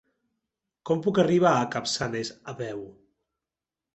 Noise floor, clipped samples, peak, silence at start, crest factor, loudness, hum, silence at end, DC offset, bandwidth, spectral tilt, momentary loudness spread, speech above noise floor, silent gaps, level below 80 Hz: -90 dBFS; under 0.1%; -8 dBFS; 0.85 s; 20 dB; -26 LUFS; none; 1.05 s; under 0.1%; 8.4 kHz; -5 dB/octave; 18 LU; 64 dB; none; -64 dBFS